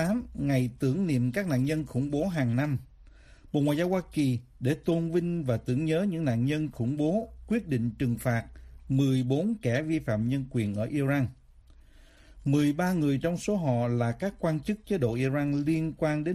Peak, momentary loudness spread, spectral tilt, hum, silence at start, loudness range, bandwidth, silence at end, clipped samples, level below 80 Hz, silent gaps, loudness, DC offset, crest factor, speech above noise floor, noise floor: -14 dBFS; 5 LU; -7.5 dB/octave; none; 0 s; 1 LU; 14 kHz; 0 s; under 0.1%; -52 dBFS; none; -29 LUFS; under 0.1%; 14 dB; 27 dB; -55 dBFS